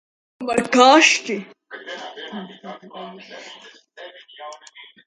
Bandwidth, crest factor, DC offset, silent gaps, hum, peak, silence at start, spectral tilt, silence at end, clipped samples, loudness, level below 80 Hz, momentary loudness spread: 11.5 kHz; 22 dB; under 0.1%; none; none; 0 dBFS; 0.4 s; -2 dB/octave; 0.5 s; under 0.1%; -15 LUFS; -68 dBFS; 27 LU